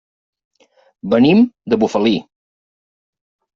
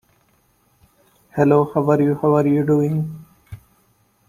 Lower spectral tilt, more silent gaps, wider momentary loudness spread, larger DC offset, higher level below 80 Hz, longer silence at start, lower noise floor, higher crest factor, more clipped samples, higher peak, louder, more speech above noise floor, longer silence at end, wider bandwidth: second, -5.5 dB/octave vs -10 dB/octave; neither; second, 9 LU vs 13 LU; neither; about the same, -56 dBFS vs -56 dBFS; second, 1.05 s vs 1.35 s; first, under -90 dBFS vs -61 dBFS; about the same, 16 dB vs 18 dB; neither; about the same, -2 dBFS vs -2 dBFS; first, -15 LUFS vs -18 LUFS; first, over 76 dB vs 44 dB; first, 1.35 s vs 0.7 s; second, 7.4 kHz vs 15 kHz